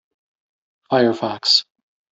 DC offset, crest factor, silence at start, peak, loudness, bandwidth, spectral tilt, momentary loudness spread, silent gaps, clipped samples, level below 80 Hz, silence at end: under 0.1%; 20 dB; 0.9 s; -2 dBFS; -17 LUFS; 8 kHz; -3.5 dB/octave; 6 LU; none; under 0.1%; -66 dBFS; 0.5 s